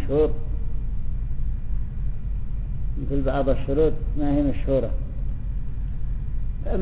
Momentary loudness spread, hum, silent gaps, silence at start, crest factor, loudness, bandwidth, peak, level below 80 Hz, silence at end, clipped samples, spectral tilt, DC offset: 9 LU; none; none; 0 s; 16 dB; -27 LUFS; 3.8 kHz; -8 dBFS; -26 dBFS; 0 s; under 0.1%; -12 dB/octave; 1%